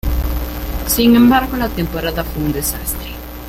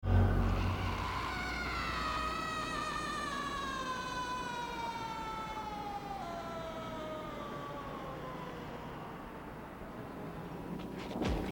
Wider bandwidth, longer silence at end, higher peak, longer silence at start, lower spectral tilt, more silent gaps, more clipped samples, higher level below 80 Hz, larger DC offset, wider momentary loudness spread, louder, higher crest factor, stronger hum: second, 17 kHz vs 19 kHz; about the same, 0 s vs 0 s; first, -2 dBFS vs -18 dBFS; about the same, 0.05 s vs 0 s; about the same, -4.5 dB/octave vs -5.5 dB/octave; neither; neither; first, -24 dBFS vs -46 dBFS; neither; first, 14 LU vs 10 LU; first, -16 LUFS vs -39 LUFS; second, 14 dB vs 20 dB; neither